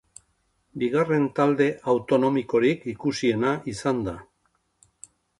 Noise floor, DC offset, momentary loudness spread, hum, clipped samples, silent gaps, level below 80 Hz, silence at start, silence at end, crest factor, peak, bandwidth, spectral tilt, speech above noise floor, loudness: -70 dBFS; under 0.1%; 8 LU; none; under 0.1%; none; -58 dBFS; 0.75 s; 1.15 s; 18 dB; -8 dBFS; 11.5 kHz; -6.5 dB/octave; 47 dB; -24 LUFS